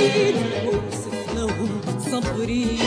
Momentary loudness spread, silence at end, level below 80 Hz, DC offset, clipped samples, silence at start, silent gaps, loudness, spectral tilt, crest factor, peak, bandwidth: 7 LU; 0 s; -40 dBFS; under 0.1%; under 0.1%; 0 s; none; -24 LUFS; -5 dB/octave; 14 dB; -8 dBFS; 11 kHz